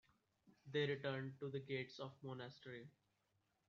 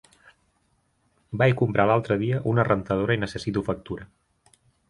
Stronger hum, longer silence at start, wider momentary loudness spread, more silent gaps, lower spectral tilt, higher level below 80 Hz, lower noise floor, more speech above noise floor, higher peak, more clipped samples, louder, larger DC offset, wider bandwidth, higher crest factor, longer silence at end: neither; second, 0.45 s vs 1.3 s; first, 15 LU vs 12 LU; neither; second, -4.5 dB/octave vs -7.5 dB/octave; second, -86 dBFS vs -52 dBFS; first, -85 dBFS vs -69 dBFS; second, 38 dB vs 45 dB; second, -30 dBFS vs -6 dBFS; neither; second, -47 LUFS vs -24 LUFS; neither; second, 7.2 kHz vs 11 kHz; about the same, 20 dB vs 20 dB; about the same, 0.8 s vs 0.85 s